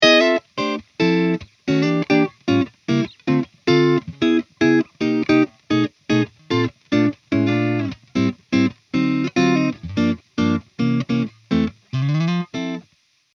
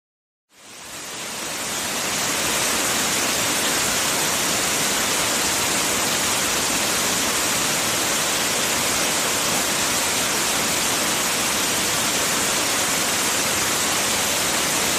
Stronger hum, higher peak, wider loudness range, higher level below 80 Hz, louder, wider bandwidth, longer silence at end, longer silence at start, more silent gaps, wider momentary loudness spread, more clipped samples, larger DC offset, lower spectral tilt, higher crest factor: neither; first, 0 dBFS vs -8 dBFS; about the same, 2 LU vs 1 LU; about the same, -54 dBFS vs -50 dBFS; about the same, -20 LUFS vs -19 LUFS; second, 7.2 kHz vs 15.5 kHz; first, 0.55 s vs 0 s; second, 0 s vs 0.6 s; neither; first, 6 LU vs 3 LU; neither; neither; first, -6.5 dB/octave vs -0.5 dB/octave; first, 20 dB vs 14 dB